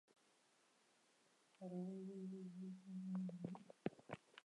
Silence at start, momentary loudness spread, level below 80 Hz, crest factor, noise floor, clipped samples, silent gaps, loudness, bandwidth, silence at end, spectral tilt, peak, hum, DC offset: 1.6 s; 8 LU; under -90 dBFS; 26 dB; -78 dBFS; under 0.1%; none; -52 LUFS; 11 kHz; 0.05 s; -8 dB/octave; -26 dBFS; none; under 0.1%